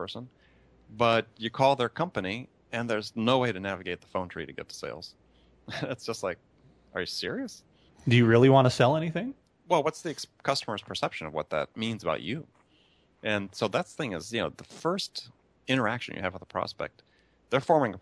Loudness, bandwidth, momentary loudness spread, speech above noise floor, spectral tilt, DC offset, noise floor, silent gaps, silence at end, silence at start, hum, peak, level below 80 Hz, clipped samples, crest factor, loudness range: -29 LUFS; 11 kHz; 15 LU; 36 dB; -5.5 dB/octave; under 0.1%; -65 dBFS; none; 0 s; 0 s; none; -6 dBFS; -64 dBFS; under 0.1%; 22 dB; 11 LU